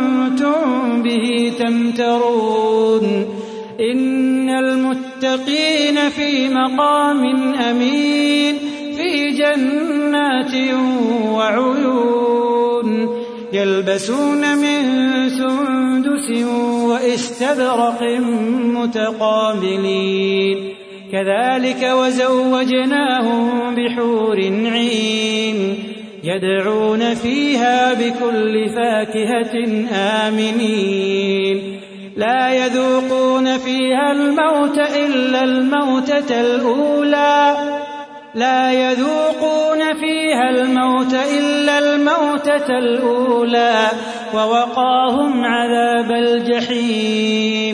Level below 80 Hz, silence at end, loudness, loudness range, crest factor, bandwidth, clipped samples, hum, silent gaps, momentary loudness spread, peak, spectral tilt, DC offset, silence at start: -64 dBFS; 0 s; -16 LUFS; 2 LU; 14 dB; 11 kHz; under 0.1%; none; none; 5 LU; -2 dBFS; -4.5 dB/octave; under 0.1%; 0 s